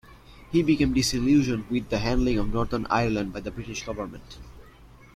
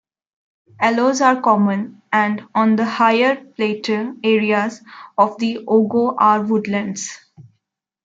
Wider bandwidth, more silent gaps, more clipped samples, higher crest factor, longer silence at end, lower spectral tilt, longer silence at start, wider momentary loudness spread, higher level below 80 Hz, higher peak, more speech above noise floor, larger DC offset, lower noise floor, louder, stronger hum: first, 15.5 kHz vs 7.8 kHz; neither; neither; about the same, 16 dB vs 16 dB; second, 0.3 s vs 0.65 s; about the same, -5.5 dB/octave vs -5 dB/octave; second, 0.1 s vs 0.8 s; first, 13 LU vs 9 LU; first, -38 dBFS vs -68 dBFS; second, -10 dBFS vs -2 dBFS; second, 25 dB vs 57 dB; neither; second, -50 dBFS vs -74 dBFS; second, -25 LUFS vs -17 LUFS; neither